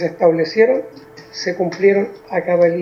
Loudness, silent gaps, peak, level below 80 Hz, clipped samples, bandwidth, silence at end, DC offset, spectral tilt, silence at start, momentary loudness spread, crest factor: -17 LUFS; none; 0 dBFS; -62 dBFS; under 0.1%; 7 kHz; 0 s; under 0.1%; -6 dB/octave; 0 s; 10 LU; 16 dB